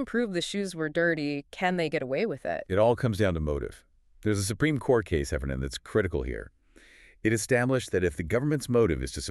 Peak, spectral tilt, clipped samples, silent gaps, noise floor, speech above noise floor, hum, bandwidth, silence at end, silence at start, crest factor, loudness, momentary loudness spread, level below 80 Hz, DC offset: -10 dBFS; -5.5 dB/octave; under 0.1%; none; -56 dBFS; 28 dB; none; 13.5 kHz; 0 s; 0 s; 18 dB; -28 LUFS; 8 LU; -44 dBFS; under 0.1%